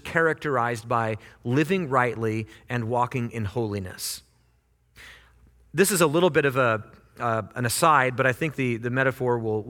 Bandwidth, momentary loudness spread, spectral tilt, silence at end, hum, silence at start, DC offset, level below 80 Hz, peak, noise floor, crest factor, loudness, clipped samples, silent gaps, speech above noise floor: 18.5 kHz; 11 LU; -5 dB/octave; 0 s; none; 0.05 s; under 0.1%; -58 dBFS; -6 dBFS; -64 dBFS; 20 dB; -24 LUFS; under 0.1%; none; 40 dB